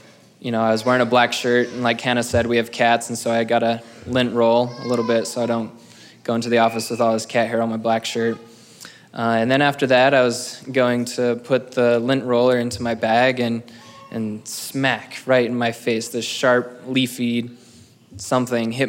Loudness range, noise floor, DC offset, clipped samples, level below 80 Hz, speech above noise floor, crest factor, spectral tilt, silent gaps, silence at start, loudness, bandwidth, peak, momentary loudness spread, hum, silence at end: 3 LU; -48 dBFS; under 0.1%; under 0.1%; -58 dBFS; 29 dB; 16 dB; -4.5 dB/octave; none; 0.45 s; -20 LUFS; 16.5 kHz; -4 dBFS; 10 LU; none; 0 s